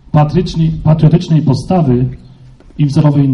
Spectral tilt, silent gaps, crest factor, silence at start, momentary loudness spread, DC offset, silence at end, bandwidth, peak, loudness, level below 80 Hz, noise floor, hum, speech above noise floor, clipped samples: -9 dB/octave; none; 10 dB; 0.15 s; 5 LU; under 0.1%; 0 s; 7 kHz; 0 dBFS; -12 LUFS; -32 dBFS; -38 dBFS; none; 28 dB; under 0.1%